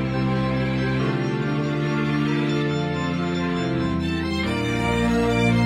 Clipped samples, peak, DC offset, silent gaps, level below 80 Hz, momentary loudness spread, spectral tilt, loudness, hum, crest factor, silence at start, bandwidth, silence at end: under 0.1%; -8 dBFS; under 0.1%; none; -40 dBFS; 4 LU; -7 dB/octave; -23 LUFS; none; 14 dB; 0 s; 12.5 kHz; 0 s